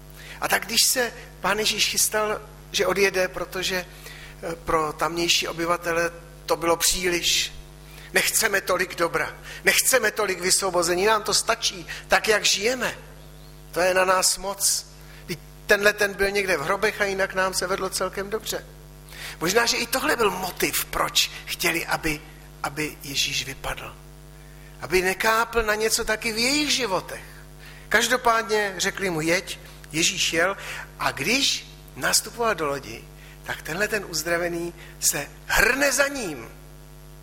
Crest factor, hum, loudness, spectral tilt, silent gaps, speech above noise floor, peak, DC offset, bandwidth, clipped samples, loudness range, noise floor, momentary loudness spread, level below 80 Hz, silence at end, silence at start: 20 dB; none; -23 LUFS; -1.5 dB/octave; none; 20 dB; -4 dBFS; under 0.1%; 16.5 kHz; under 0.1%; 4 LU; -44 dBFS; 15 LU; -46 dBFS; 0 s; 0 s